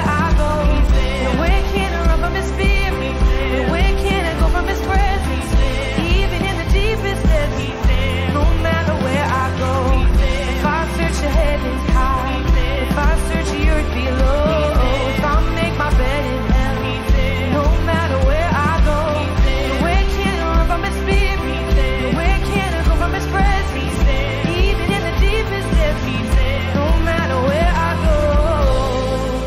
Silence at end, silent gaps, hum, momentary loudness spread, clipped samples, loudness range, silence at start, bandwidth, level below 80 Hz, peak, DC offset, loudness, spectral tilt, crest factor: 0 s; none; none; 3 LU; under 0.1%; 1 LU; 0 s; 14.5 kHz; -18 dBFS; -6 dBFS; under 0.1%; -18 LUFS; -6 dB/octave; 10 dB